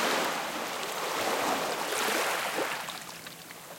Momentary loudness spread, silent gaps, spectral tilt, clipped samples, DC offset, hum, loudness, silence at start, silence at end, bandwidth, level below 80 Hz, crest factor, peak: 13 LU; none; -1.5 dB/octave; under 0.1%; under 0.1%; none; -30 LUFS; 0 s; 0 s; 17 kHz; -70 dBFS; 16 dB; -14 dBFS